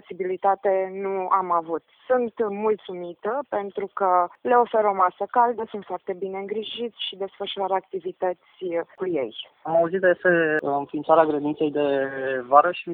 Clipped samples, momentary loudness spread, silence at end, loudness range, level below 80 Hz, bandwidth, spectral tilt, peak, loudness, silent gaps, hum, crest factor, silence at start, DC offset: under 0.1%; 12 LU; 0 s; 7 LU; -72 dBFS; 4.4 kHz; -8.5 dB/octave; -2 dBFS; -24 LUFS; none; none; 22 dB; 0.1 s; under 0.1%